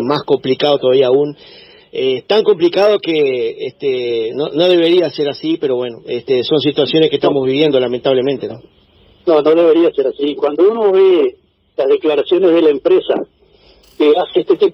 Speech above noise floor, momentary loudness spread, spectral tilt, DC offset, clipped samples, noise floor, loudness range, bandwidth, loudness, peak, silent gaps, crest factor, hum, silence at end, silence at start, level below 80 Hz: 35 dB; 9 LU; -7.5 dB/octave; under 0.1%; under 0.1%; -48 dBFS; 2 LU; 6.2 kHz; -14 LUFS; 0 dBFS; none; 14 dB; none; 0 s; 0 s; -58 dBFS